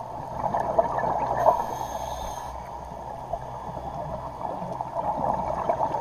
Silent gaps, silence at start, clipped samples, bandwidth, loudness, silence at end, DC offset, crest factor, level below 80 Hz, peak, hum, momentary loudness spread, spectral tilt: none; 0 s; under 0.1%; 15 kHz; -29 LUFS; 0 s; under 0.1%; 24 dB; -46 dBFS; -4 dBFS; none; 13 LU; -6 dB/octave